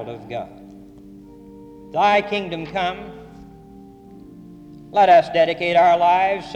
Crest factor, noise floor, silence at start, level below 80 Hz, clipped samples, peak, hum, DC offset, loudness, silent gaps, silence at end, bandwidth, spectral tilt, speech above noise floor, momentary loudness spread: 16 dB; -43 dBFS; 0 s; -54 dBFS; under 0.1%; -4 dBFS; none; under 0.1%; -18 LUFS; none; 0 s; 9 kHz; -5.5 dB/octave; 25 dB; 19 LU